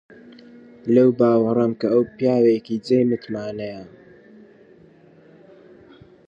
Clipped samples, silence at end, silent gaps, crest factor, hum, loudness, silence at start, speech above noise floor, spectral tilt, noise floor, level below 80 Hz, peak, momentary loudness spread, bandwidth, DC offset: under 0.1%; 2.4 s; none; 18 dB; none; -19 LUFS; 0.85 s; 31 dB; -8.5 dB/octave; -50 dBFS; -64 dBFS; -4 dBFS; 15 LU; 7.6 kHz; under 0.1%